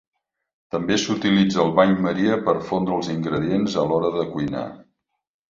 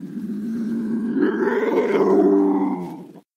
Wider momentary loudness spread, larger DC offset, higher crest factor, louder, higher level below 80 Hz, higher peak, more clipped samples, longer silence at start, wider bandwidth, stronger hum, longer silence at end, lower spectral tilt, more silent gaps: second, 9 LU vs 13 LU; neither; first, 20 dB vs 14 dB; about the same, -21 LUFS vs -20 LUFS; first, -54 dBFS vs -66 dBFS; first, -2 dBFS vs -6 dBFS; neither; first, 0.75 s vs 0 s; about the same, 7.6 kHz vs 7.2 kHz; neither; first, 0.7 s vs 0.15 s; second, -6 dB/octave vs -8 dB/octave; neither